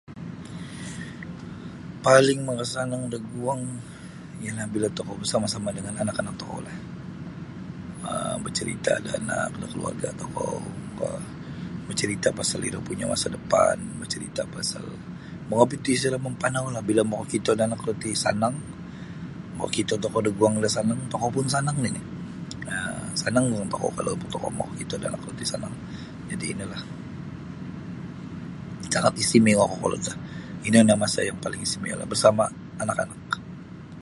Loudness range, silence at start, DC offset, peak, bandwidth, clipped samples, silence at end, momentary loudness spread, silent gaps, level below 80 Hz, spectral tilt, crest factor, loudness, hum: 8 LU; 0.1 s; under 0.1%; -2 dBFS; 11.5 kHz; under 0.1%; 0 s; 17 LU; none; -52 dBFS; -4.5 dB/octave; 26 dB; -26 LUFS; none